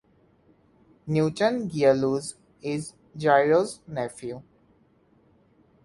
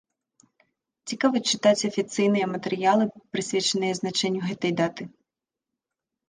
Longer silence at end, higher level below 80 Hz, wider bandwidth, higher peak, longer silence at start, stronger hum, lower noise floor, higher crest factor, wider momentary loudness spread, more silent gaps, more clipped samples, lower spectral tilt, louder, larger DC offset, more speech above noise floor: first, 1.45 s vs 1.2 s; first, -64 dBFS vs -72 dBFS; first, 11.5 kHz vs 10 kHz; about the same, -6 dBFS vs -6 dBFS; about the same, 1.05 s vs 1.05 s; neither; second, -62 dBFS vs -88 dBFS; about the same, 22 dB vs 20 dB; first, 17 LU vs 9 LU; neither; neither; first, -6 dB/octave vs -4 dB/octave; about the same, -25 LUFS vs -24 LUFS; neither; second, 38 dB vs 64 dB